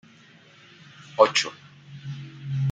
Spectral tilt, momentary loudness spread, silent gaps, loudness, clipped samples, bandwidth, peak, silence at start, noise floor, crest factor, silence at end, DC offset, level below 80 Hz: -4 dB/octave; 24 LU; none; -23 LUFS; under 0.1%; 9.4 kHz; -2 dBFS; 1 s; -53 dBFS; 24 dB; 0 s; under 0.1%; -72 dBFS